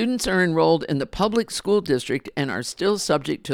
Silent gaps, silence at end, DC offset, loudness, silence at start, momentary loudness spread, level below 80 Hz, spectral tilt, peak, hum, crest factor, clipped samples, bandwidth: none; 0 s; under 0.1%; -22 LUFS; 0 s; 7 LU; -48 dBFS; -4.5 dB/octave; -6 dBFS; none; 16 dB; under 0.1%; 17 kHz